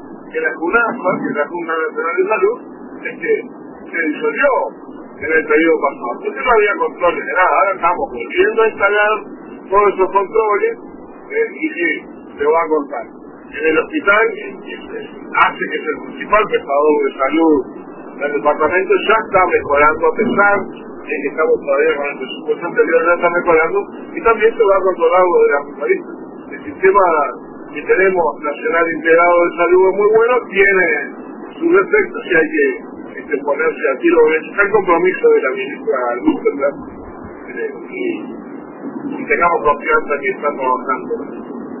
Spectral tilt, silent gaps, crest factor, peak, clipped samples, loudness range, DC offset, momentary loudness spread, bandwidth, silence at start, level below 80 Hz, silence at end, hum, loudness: -9 dB/octave; none; 16 dB; 0 dBFS; under 0.1%; 5 LU; under 0.1%; 16 LU; 3.1 kHz; 0 s; -48 dBFS; 0 s; none; -15 LUFS